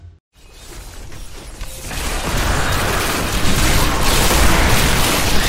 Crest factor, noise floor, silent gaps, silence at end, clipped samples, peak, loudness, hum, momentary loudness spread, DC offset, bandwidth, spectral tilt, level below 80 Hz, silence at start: 16 dB; -36 dBFS; 0.20-0.31 s; 0 s; under 0.1%; 0 dBFS; -16 LUFS; none; 22 LU; under 0.1%; 16.5 kHz; -3 dB/octave; -22 dBFS; 0 s